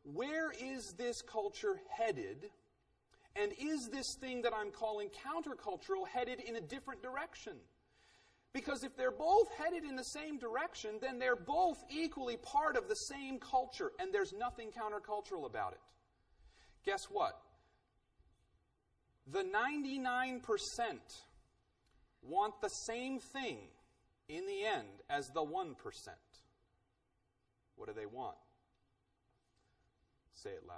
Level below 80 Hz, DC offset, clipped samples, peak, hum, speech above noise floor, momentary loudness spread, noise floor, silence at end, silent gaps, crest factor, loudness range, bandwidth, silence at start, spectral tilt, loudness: -70 dBFS; under 0.1%; under 0.1%; -20 dBFS; none; 41 dB; 12 LU; -82 dBFS; 0 s; none; 22 dB; 8 LU; 11 kHz; 0.05 s; -3 dB/octave; -40 LUFS